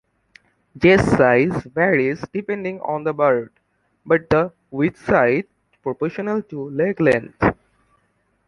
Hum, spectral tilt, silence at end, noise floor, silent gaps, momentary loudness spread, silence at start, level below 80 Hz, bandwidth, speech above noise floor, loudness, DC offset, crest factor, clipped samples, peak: none; -7.5 dB/octave; 0.95 s; -65 dBFS; none; 12 LU; 0.75 s; -46 dBFS; 11 kHz; 47 dB; -19 LUFS; under 0.1%; 18 dB; under 0.1%; -2 dBFS